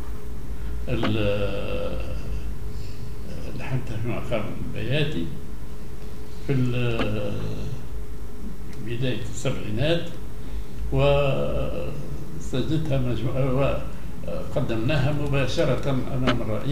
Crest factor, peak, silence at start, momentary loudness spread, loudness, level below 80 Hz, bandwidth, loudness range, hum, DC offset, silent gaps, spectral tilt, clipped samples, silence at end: 18 dB; -6 dBFS; 0 s; 14 LU; -27 LUFS; -36 dBFS; 16 kHz; 5 LU; none; 6%; none; -6.5 dB/octave; under 0.1%; 0 s